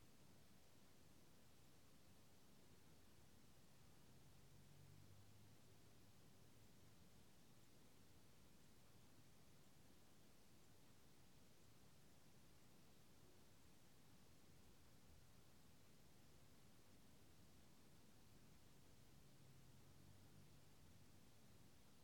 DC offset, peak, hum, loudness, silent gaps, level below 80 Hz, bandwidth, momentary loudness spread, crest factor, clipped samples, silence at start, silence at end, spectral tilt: under 0.1%; -54 dBFS; none; -69 LUFS; none; -82 dBFS; 17.5 kHz; 1 LU; 16 dB; under 0.1%; 0 s; 0 s; -4 dB/octave